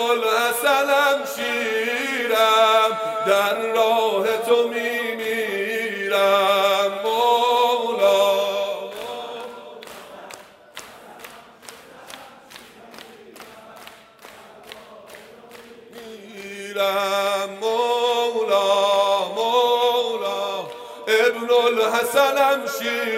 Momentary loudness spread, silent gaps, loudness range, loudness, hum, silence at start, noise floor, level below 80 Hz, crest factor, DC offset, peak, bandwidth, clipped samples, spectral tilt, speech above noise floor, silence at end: 23 LU; none; 22 LU; -20 LUFS; none; 0 s; -45 dBFS; -72 dBFS; 18 dB; under 0.1%; -4 dBFS; 16 kHz; under 0.1%; -2 dB/octave; 25 dB; 0 s